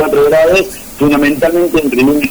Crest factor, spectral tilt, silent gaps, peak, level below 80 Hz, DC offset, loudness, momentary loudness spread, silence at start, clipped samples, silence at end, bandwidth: 6 dB; -5 dB/octave; none; -4 dBFS; -34 dBFS; 0.8%; -10 LUFS; 4 LU; 0 s; under 0.1%; 0 s; over 20 kHz